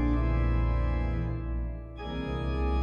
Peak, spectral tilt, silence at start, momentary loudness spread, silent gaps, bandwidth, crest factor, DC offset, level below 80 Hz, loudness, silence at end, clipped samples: -16 dBFS; -9 dB/octave; 0 s; 9 LU; none; 5.2 kHz; 12 dB; under 0.1%; -30 dBFS; -31 LUFS; 0 s; under 0.1%